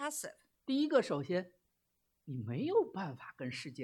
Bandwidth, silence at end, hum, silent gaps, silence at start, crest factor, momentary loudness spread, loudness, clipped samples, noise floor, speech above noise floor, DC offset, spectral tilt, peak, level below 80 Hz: 16 kHz; 0 s; none; none; 0 s; 20 dB; 15 LU; -36 LUFS; under 0.1%; -82 dBFS; 46 dB; under 0.1%; -5 dB/octave; -18 dBFS; -82 dBFS